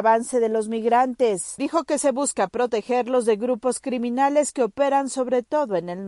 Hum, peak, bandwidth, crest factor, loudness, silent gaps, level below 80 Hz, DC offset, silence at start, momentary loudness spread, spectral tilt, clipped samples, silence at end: none; -8 dBFS; 11.5 kHz; 14 dB; -22 LUFS; none; -64 dBFS; under 0.1%; 0 s; 5 LU; -4 dB/octave; under 0.1%; 0 s